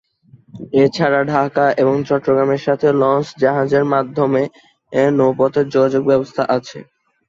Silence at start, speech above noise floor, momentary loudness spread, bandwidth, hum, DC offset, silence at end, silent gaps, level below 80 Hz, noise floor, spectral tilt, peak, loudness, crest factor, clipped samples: 0.55 s; 33 dB; 5 LU; 7.6 kHz; none; under 0.1%; 0.45 s; none; -58 dBFS; -49 dBFS; -7.5 dB/octave; -2 dBFS; -16 LUFS; 14 dB; under 0.1%